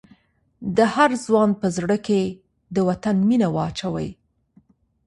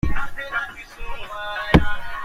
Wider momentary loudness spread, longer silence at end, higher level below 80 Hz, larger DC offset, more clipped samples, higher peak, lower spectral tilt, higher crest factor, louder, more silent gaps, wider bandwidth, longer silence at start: second, 11 LU vs 17 LU; first, 0.95 s vs 0 s; second, -54 dBFS vs -30 dBFS; neither; neither; about the same, -2 dBFS vs -2 dBFS; about the same, -6.5 dB/octave vs -6.5 dB/octave; about the same, 20 dB vs 20 dB; about the same, -21 LUFS vs -23 LUFS; neither; about the same, 11.5 kHz vs 11.5 kHz; first, 0.6 s vs 0.05 s